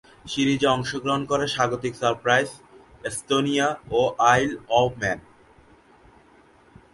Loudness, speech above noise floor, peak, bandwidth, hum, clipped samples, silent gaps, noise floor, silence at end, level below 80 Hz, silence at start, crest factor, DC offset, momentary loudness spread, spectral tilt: -23 LUFS; 32 dB; -4 dBFS; 11.5 kHz; none; under 0.1%; none; -55 dBFS; 1.75 s; -54 dBFS; 0.25 s; 20 dB; under 0.1%; 12 LU; -4 dB/octave